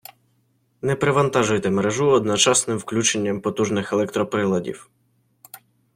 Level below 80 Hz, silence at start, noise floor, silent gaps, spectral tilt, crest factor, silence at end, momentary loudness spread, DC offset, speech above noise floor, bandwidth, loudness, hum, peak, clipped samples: -58 dBFS; 0.85 s; -65 dBFS; none; -4 dB/octave; 18 dB; 0.4 s; 9 LU; under 0.1%; 45 dB; 16.5 kHz; -20 LUFS; none; -4 dBFS; under 0.1%